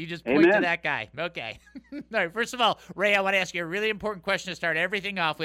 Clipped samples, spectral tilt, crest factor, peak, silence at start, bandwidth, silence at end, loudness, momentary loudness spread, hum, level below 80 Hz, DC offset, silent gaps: under 0.1%; -4 dB/octave; 18 dB; -10 dBFS; 0 s; 15.5 kHz; 0 s; -25 LUFS; 12 LU; none; -60 dBFS; under 0.1%; none